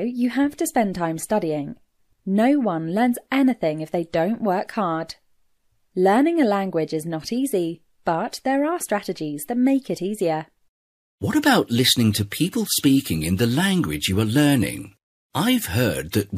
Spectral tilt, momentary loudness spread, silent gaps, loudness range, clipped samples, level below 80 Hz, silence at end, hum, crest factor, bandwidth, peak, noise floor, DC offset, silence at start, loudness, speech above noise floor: -5 dB/octave; 10 LU; 10.69-11.18 s, 15.03-15.30 s; 4 LU; under 0.1%; -52 dBFS; 0 s; none; 16 dB; 15.5 kHz; -4 dBFS; -64 dBFS; under 0.1%; 0 s; -22 LUFS; 43 dB